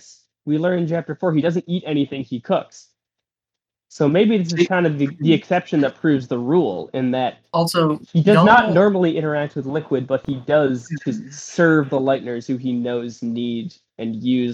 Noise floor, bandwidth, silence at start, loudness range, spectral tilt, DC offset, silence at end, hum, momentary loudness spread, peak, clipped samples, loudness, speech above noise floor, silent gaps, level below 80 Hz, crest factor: -87 dBFS; 13.5 kHz; 0.45 s; 6 LU; -6.5 dB/octave; under 0.1%; 0 s; none; 10 LU; 0 dBFS; under 0.1%; -19 LUFS; 68 dB; none; -60 dBFS; 18 dB